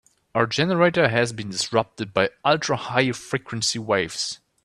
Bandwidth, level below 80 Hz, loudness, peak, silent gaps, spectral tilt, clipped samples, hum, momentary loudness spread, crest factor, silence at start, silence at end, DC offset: 13 kHz; -60 dBFS; -23 LUFS; -2 dBFS; none; -4 dB/octave; under 0.1%; none; 9 LU; 20 dB; 0.35 s; 0.3 s; under 0.1%